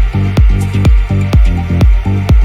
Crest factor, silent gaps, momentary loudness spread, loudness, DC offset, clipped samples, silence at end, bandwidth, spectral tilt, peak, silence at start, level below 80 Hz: 8 dB; none; 2 LU; -11 LUFS; under 0.1%; under 0.1%; 0 s; 10 kHz; -7.5 dB/octave; 0 dBFS; 0 s; -10 dBFS